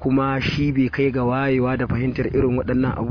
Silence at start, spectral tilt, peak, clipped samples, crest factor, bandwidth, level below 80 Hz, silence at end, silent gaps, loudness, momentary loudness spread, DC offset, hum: 0 s; -8.5 dB/octave; -8 dBFS; under 0.1%; 12 dB; 5.4 kHz; -38 dBFS; 0 s; none; -21 LUFS; 2 LU; under 0.1%; none